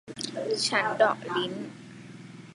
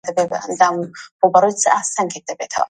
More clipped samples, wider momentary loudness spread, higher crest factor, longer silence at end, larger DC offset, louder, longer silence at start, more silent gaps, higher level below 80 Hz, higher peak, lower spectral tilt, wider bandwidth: neither; first, 21 LU vs 12 LU; about the same, 22 dB vs 18 dB; about the same, 0 s vs 0.05 s; neither; second, -27 LUFS vs -17 LUFS; about the same, 0.05 s vs 0.05 s; second, none vs 1.11-1.19 s; second, -74 dBFS vs -64 dBFS; second, -8 dBFS vs 0 dBFS; about the same, -3 dB/octave vs -3 dB/octave; about the same, 11.5 kHz vs 11 kHz